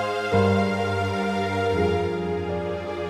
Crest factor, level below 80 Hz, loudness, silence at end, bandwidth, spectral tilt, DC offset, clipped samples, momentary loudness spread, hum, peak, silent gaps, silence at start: 14 dB; -48 dBFS; -24 LUFS; 0 s; 13 kHz; -6.5 dB/octave; under 0.1%; under 0.1%; 7 LU; none; -8 dBFS; none; 0 s